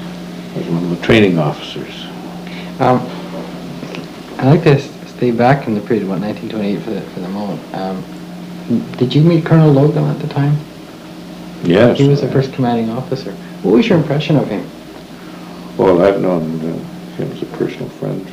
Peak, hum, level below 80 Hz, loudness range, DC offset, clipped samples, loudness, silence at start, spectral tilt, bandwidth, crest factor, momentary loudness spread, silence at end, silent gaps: 0 dBFS; none; -46 dBFS; 4 LU; under 0.1%; under 0.1%; -15 LUFS; 0 s; -8 dB/octave; 15.5 kHz; 14 dB; 19 LU; 0 s; none